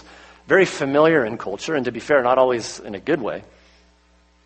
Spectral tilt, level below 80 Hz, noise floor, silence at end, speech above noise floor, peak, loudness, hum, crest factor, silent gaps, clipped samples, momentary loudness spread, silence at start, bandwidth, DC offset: -5 dB/octave; -56 dBFS; -57 dBFS; 1.05 s; 38 dB; -2 dBFS; -20 LUFS; none; 18 dB; none; under 0.1%; 13 LU; 0.5 s; 8.8 kHz; under 0.1%